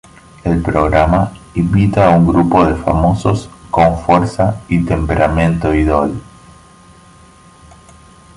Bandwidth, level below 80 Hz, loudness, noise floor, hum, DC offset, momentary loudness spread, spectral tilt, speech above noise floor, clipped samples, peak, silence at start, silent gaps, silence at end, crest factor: 11.5 kHz; -26 dBFS; -13 LUFS; -42 dBFS; none; under 0.1%; 8 LU; -8 dB/octave; 30 dB; under 0.1%; 0 dBFS; 0.45 s; none; 2.15 s; 14 dB